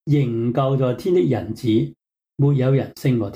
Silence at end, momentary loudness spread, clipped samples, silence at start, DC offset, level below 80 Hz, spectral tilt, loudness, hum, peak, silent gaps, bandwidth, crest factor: 0 s; 4 LU; under 0.1%; 0.05 s; under 0.1%; -56 dBFS; -9 dB/octave; -20 LUFS; none; -8 dBFS; none; 15 kHz; 12 dB